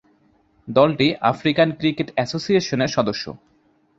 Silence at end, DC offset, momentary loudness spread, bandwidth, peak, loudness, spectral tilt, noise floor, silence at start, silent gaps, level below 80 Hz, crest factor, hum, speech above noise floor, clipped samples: 0.65 s; under 0.1%; 7 LU; 7.8 kHz; -2 dBFS; -20 LUFS; -5.5 dB/octave; -59 dBFS; 0.65 s; none; -56 dBFS; 20 dB; none; 40 dB; under 0.1%